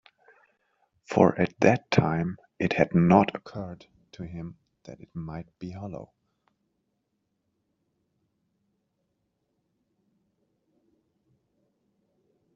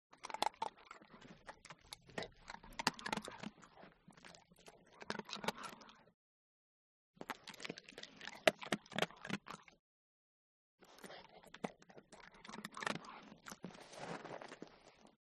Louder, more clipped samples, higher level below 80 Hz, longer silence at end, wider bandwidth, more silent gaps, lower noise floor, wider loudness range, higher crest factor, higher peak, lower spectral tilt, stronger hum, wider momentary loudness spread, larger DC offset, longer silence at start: first, -24 LUFS vs -45 LUFS; neither; first, -62 dBFS vs -76 dBFS; first, 6.5 s vs 0.15 s; second, 7.4 kHz vs 12 kHz; second, none vs 6.14-7.14 s, 9.79-10.78 s; first, -78 dBFS vs -65 dBFS; first, 19 LU vs 8 LU; second, 26 dB vs 38 dB; first, -4 dBFS vs -10 dBFS; first, -6.5 dB/octave vs -3 dB/octave; neither; about the same, 20 LU vs 21 LU; neither; first, 1.1 s vs 0.1 s